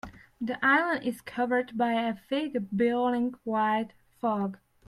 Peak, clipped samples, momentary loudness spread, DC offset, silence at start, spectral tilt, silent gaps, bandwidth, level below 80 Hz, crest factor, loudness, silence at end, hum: -10 dBFS; under 0.1%; 11 LU; under 0.1%; 0.05 s; -6 dB/octave; none; 13.5 kHz; -66 dBFS; 18 dB; -28 LUFS; 0.3 s; none